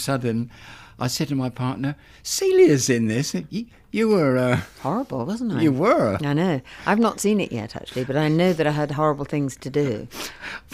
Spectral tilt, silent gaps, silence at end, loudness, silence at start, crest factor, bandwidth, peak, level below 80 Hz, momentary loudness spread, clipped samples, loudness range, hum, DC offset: -5.5 dB/octave; none; 0.15 s; -22 LUFS; 0 s; 16 dB; 16 kHz; -6 dBFS; -52 dBFS; 12 LU; under 0.1%; 2 LU; none; under 0.1%